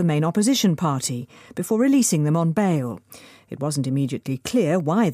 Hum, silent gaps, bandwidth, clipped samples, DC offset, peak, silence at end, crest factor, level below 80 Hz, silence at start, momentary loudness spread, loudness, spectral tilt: none; none; 15.5 kHz; under 0.1%; under 0.1%; -8 dBFS; 0 s; 12 dB; -64 dBFS; 0 s; 13 LU; -21 LUFS; -5.5 dB/octave